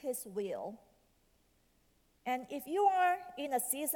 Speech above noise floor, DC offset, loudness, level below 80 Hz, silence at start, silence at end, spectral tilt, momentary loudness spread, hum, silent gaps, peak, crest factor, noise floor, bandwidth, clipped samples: 37 dB; under 0.1%; -35 LUFS; -76 dBFS; 0.05 s; 0 s; -2.5 dB/octave; 13 LU; none; none; -18 dBFS; 18 dB; -72 dBFS; 19 kHz; under 0.1%